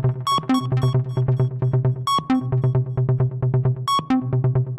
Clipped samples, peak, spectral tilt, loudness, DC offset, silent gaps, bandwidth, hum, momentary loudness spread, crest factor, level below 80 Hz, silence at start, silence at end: under 0.1%; -10 dBFS; -7.5 dB/octave; -21 LUFS; under 0.1%; none; 13 kHz; none; 2 LU; 10 dB; -46 dBFS; 0 s; 0 s